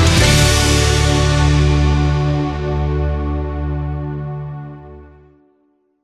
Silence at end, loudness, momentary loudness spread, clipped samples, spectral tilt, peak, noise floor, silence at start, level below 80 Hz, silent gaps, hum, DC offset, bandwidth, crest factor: 1 s; -16 LUFS; 15 LU; under 0.1%; -4.5 dB/octave; -2 dBFS; -60 dBFS; 0 s; -20 dBFS; none; none; under 0.1%; 14.5 kHz; 14 dB